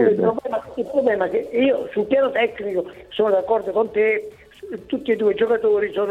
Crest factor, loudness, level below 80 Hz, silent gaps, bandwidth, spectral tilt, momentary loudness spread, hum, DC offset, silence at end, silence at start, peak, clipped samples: 14 dB; -21 LUFS; -58 dBFS; none; 4.7 kHz; -7 dB/octave; 9 LU; none; under 0.1%; 0 s; 0 s; -6 dBFS; under 0.1%